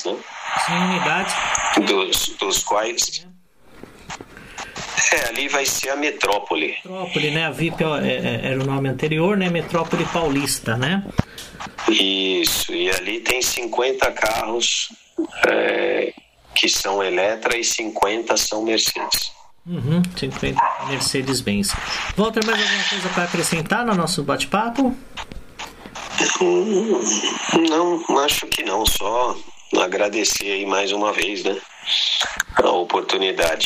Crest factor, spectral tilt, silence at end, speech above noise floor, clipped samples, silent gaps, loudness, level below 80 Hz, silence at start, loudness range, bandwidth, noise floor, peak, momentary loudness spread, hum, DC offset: 18 dB; -3 dB/octave; 0 s; 29 dB; under 0.1%; none; -20 LUFS; -44 dBFS; 0 s; 2 LU; 16 kHz; -49 dBFS; -4 dBFS; 10 LU; none; under 0.1%